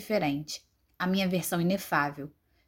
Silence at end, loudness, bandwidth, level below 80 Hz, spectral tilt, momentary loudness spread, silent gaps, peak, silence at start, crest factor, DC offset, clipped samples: 0.4 s; -30 LUFS; 17 kHz; -64 dBFS; -5 dB/octave; 13 LU; none; -12 dBFS; 0 s; 20 dB; under 0.1%; under 0.1%